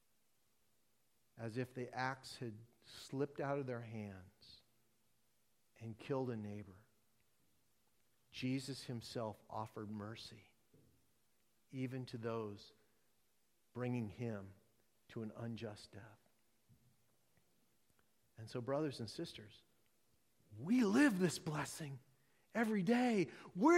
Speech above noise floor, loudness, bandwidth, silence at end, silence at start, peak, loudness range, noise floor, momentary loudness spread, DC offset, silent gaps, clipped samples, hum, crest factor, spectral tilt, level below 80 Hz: 41 dB; -42 LUFS; 16 kHz; 0 s; 1.35 s; -22 dBFS; 11 LU; -82 dBFS; 21 LU; under 0.1%; none; under 0.1%; none; 22 dB; -6 dB/octave; -80 dBFS